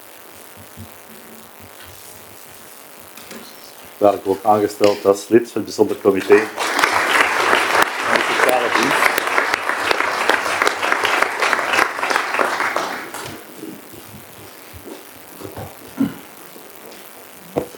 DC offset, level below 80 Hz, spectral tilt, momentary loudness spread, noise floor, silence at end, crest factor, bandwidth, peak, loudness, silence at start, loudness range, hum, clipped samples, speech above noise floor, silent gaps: under 0.1%; -58 dBFS; -3 dB/octave; 22 LU; -40 dBFS; 0 s; 20 dB; 19.5 kHz; 0 dBFS; -17 LUFS; 0 s; 15 LU; none; under 0.1%; 24 dB; none